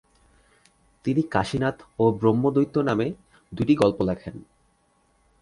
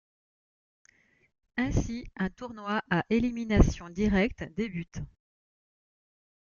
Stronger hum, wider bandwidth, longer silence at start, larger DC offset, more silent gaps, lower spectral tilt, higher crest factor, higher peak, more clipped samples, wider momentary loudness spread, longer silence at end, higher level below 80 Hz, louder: neither; first, 11.5 kHz vs 7.2 kHz; second, 1.05 s vs 1.55 s; neither; neither; about the same, -7.5 dB/octave vs -6.5 dB/octave; about the same, 20 dB vs 24 dB; first, -4 dBFS vs -8 dBFS; neither; first, 16 LU vs 13 LU; second, 1 s vs 1.4 s; second, -52 dBFS vs -38 dBFS; first, -24 LUFS vs -30 LUFS